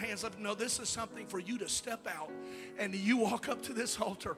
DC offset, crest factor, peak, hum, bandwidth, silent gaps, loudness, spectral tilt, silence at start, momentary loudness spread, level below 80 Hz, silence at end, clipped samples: under 0.1%; 20 dB; -18 dBFS; none; 16 kHz; none; -36 LUFS; -3 dB/octave; 0 s; 10 LU; -66 dBFS; 0 s; under 0.1%